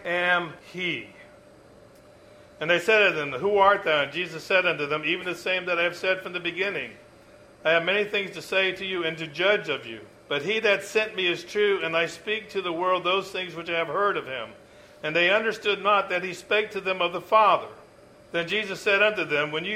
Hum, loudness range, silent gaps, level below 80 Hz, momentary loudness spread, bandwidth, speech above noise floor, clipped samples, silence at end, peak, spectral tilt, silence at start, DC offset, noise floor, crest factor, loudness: none; 3 LU; none; -66 dBFS; 11 LU; 15.5 kHz; 27 dB; under 0.1%; 0 s; -6 dBFS; -4 dB/octave; 0 s; under 0.1%; -52 dBFS; 20 dB; -24 LUFS